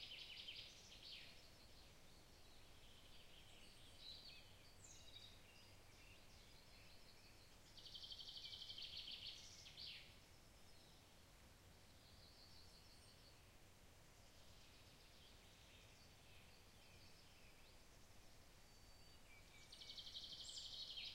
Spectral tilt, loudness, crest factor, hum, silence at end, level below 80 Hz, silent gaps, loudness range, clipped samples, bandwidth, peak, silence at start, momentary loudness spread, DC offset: -2 dB/octave; -60 LUFS; 20 dB; none; 0 s; -72 dBFS; none; 11 LU; under 0.1%; 16 kHz; -42 dBFS; 0 s; 15 LU; under 0.1%